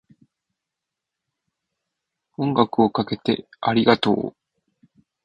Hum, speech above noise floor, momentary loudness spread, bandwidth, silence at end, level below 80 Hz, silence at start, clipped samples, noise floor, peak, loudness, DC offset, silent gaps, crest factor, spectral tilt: none; 65 dB; 9 LU; 8 kHz; 0.95 s; -60 dBFS; 2.4 s; under 0.1%; -85 dBFS; 0 dBFS; -21 LUFS; under 0.1%; none; 24 dB; -7.5 dB/octave